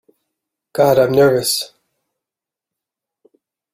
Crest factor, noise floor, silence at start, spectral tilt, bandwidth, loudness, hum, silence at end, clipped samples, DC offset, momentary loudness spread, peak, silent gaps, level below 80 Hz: 18 dB; -87 dBFS; 0.75 s; -4.5 dB/octave; 16 kHz; -14 LUFS; none; 2.05 s; under 0.1%; under 0.1%; 14 LU; -2 dBFS; none; -58 dBFS